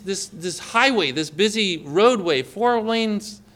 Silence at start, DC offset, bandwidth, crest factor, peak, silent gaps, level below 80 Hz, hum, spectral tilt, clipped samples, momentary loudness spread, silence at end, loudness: 0.05 s; under 0.1%; 15.5 kHz; 18 dB; -4 dBFS; none; -62 dBFS; none; -3.5 dB/octave; under 0.1%; 10 LU; 0.2 s; -20 LUFS